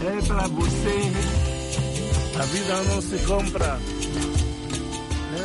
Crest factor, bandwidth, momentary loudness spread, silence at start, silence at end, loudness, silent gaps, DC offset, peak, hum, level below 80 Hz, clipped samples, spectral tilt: 12 dB; 11.5 kHz; 5 LU; 0 s; 0 s; -25 LUFS; none; under 0.1%; -12 dBFS; none; -30 dBFS; under 0.1%; -5 dB/octave